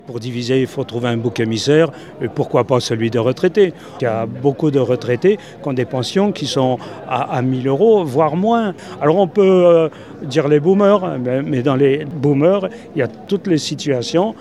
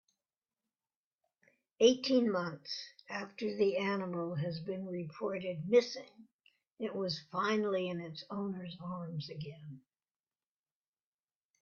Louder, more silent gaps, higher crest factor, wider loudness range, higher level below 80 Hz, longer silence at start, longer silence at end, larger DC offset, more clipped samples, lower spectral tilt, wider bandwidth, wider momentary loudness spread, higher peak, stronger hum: first, -16 LUFS vs -35 LUFS; second, none vs 6.33-6.39 s; second, 16 dB vs 22 dB; second, 3 LU vs 9 LU; first, -60 dBFS vs -78 dBFS; second, 0.1 s vs 1.8 s; second, 0 s vs 1.85 s; first, 0.2% vs under 0.1%; neither; first, -6.5 dB/octave vs -4.5 dB/octave; first, 12.5 kHz vs 7 kHz; second, 9 LU vs 13 LU; first, 0 dBFS vs -14 dBFS; neither